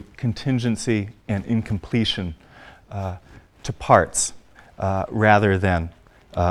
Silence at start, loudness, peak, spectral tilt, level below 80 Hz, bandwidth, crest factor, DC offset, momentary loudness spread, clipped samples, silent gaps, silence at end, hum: 0 s; -22 LUFS; 0 dBFS; -5 dB/octave; -44 dBFS; 12.5 kHz; 22 dB; under 0.1%; 17 LU; under 0.1%; none; 0 s; none